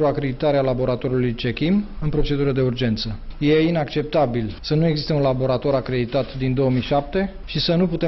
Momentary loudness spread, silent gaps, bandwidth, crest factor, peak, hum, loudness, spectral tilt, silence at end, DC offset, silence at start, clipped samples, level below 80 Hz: 5 LU; none; 6 kHz; 12 dB; -8 dBFS; none; -21 LUFS; -8.5 dB/octave; 0 s; under 0.1%; 0 s; under 0.1%; -34 dBFS